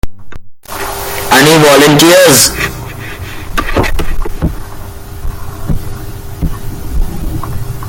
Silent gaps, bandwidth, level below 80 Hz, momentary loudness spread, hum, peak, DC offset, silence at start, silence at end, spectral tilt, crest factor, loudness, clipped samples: none; over 20 kHz; -20 dBFS; 21 LU; none; 0 dBFS; under 0.1%; 0.05 s; 0 s; -3.5 dB/octave; 10 dB; -10 LUFS; 0.5%